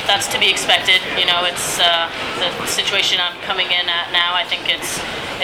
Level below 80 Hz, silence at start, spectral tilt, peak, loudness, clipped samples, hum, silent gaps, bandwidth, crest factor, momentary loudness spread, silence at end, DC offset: -50 dBFS; 0 s; -0.5 dB/octave; 0 dBFS; -16 LUFS; under 0.1%; none; none; over 20 kHz; 18 dB; 7 LU; 0 s; under 0.1%